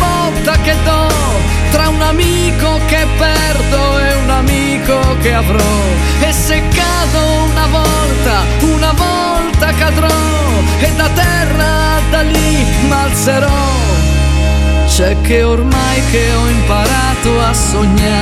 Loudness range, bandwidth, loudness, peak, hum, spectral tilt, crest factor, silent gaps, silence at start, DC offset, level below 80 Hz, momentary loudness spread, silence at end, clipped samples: 0 LU; 14.5 kHz; -11 LUFS; 0 dBFS; none; -4.5 dB/octave; 10 dB; none; 0 s; under 0.1%; -14 dBFS; 1 LU; 0 s; under 0.1%